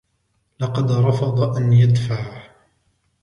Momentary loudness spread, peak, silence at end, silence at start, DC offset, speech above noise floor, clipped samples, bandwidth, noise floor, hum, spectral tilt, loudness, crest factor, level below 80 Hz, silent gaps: 12 LU; -4 dBFS; 0.8 s; 0.6 s; under 0.1%; 51 dB; under 0.1%; 6.8 kHz; -68 dBFS; none; -8 dB/octave; -18 LUFS; 16 dB; -50 dBFS; none